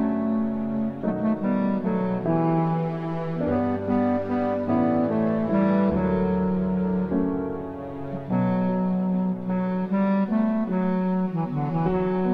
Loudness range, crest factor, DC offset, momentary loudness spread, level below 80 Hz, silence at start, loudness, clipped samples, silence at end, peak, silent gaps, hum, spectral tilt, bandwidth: 2 LU; 12 dB; under 0.1%; 5 LU; -48 dBFS; 0 s; -24 LUFS; under 0.1%; 0 s; -12 dBFS; none; none; -11 dB/octave; 4.9 kHz